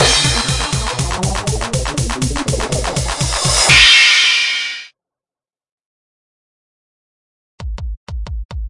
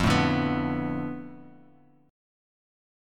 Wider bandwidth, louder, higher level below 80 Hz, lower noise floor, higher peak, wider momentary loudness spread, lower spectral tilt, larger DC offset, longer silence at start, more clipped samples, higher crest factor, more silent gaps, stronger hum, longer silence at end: second, 11.5 kHz vs 14.5 kHz; first, -12 LUFS vs -27 LUFS; first, -28 dBFS vs -48 dBFS; first, under -90 dBFS vs -58 dBFS; first, 0 dBFS vs -10 dBFS; about the same, 21 LU vs 21 LU; second, -2 dB/octave vs -6 dB/octave; neither; about the same, 0 s vs 0 s; neither; about the same, 16 dB vs 20 dB; first, 5.72-5.78 s, 5.86-7.58 s, 7.97-8.07 s, 8.45-8.49 s vs none; neither; second, 0 s vs 1 s